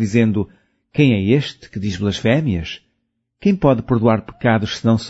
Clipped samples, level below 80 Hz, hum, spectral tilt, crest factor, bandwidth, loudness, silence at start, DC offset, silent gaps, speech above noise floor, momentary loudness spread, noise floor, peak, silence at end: under 0.1%; -44 dBFS; none; -7 dB/octave; 16 dB; 8 kHz; -18 LUFS; 0 s; under 0.1%; none; 55 dB; 11 LU; -71 dBFS; -2 dBFS; 0 s